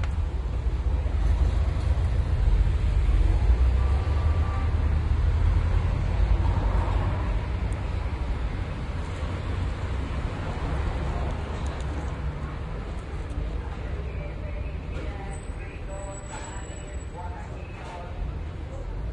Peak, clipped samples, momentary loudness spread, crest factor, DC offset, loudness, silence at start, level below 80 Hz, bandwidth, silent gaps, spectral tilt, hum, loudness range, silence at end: -10 dBFS; under 0.1%; 12 LU; 14 dB; under 0.1%; -29 LUFS; 0 s; -28 dBFS; 9.4 kHz; none; -7 dB/octave; none; 11 LU; 0 s